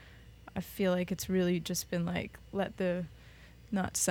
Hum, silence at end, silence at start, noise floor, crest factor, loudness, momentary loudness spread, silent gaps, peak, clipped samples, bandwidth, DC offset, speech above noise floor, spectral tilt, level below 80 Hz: none; 0 s; 0 s; -54 dBFS; 16 dB; -34 LUFS; 12 LU; none; -18 dBFS; under 0.1%; 19 kHz; under 0.1%; 21 dB; -4.5 dB/octave; -56 dBFS